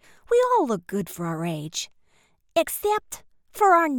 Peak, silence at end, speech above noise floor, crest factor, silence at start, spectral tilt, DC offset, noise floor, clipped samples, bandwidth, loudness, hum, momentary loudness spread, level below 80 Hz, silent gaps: -6 dBFS; 0 s; 39 dB; 18 dB; 0.3 s; -4.5 dB/octave; under 0.1%; -62 dBFS; under 0.1%; 19 kHz; -24 LUFS; none; 17 LU; -60 dBFS; none